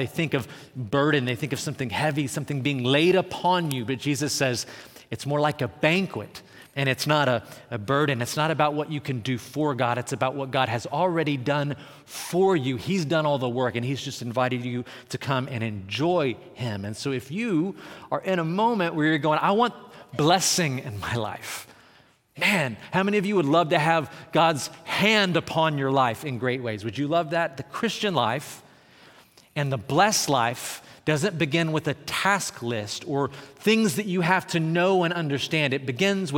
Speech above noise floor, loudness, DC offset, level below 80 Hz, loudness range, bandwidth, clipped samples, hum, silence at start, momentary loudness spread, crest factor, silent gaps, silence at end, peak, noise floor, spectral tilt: 33 dB; -25 LUFS; under 0.1%; -66 dBFS; 4 LU; 17.5 kHz; under 0.1%; none; 0 s; 10 LU; 20 dB; none; 0 s; -6 dBFS; -58 dBFS; -4.5 dB/octave